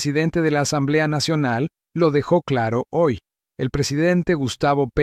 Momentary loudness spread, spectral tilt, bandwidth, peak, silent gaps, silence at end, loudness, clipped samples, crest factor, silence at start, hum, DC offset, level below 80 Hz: 5 LU; -5.5 dB/octave; 14.5 kHz; -6 dBFS; none; 0 s; -20 LUFS; under 0.1%; 14 dB; 0 s; none; under 0.1%; -46 dBFS